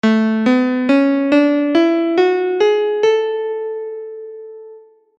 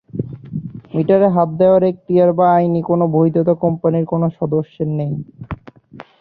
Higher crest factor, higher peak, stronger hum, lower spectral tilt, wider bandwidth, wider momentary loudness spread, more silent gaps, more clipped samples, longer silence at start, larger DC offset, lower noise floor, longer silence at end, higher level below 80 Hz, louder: about the same, 14 dB vs 14 dB; about the same, -2 dBFS vs -2 dBFS; neither; second, -6 dB/octave vs -12.5 dB/octave; first, 7.8 kHz vs 4.5 kHz; about the same, 17 LU vs 16 LU; neither; neither; about the same, 0.05 s vs 0.15 s; neither; about the same, -42 dBFS vs -40 dBFS; first, 0.4 s vs 0.2 s; second, -68 dBFS vs -50 dBFS; about the same, -15 LUFS vs -15 LUFS